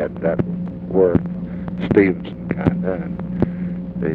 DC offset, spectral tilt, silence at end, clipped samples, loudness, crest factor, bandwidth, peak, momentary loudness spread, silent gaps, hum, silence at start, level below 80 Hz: under 0.1%; -11 dB/octave; 0 s; under 0.1%; -21 LUFS; 18 dB; 4.4 kHz; -2 dBFS; 11 LU; none; none; 0 s; -40 dBFS